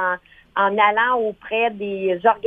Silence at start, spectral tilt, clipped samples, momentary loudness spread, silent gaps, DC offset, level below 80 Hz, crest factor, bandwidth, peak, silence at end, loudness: 0 s; -7 dB/octave; under 0.1%; 8 LU; none; under 0.1%; -60 dBFS; 18 dB; 4.7 kHz; -2 dBFS; 0 s; -20 LUFS